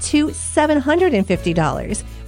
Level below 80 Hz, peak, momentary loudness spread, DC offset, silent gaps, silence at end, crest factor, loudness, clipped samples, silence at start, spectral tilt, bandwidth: -34 dBFS; -2 dBFS; 6 LU; under 0.1%; none; 0 s; 16 dB; -18 LUFS; under 0.1%; 0 s; -5 dB/octave; 15 kHz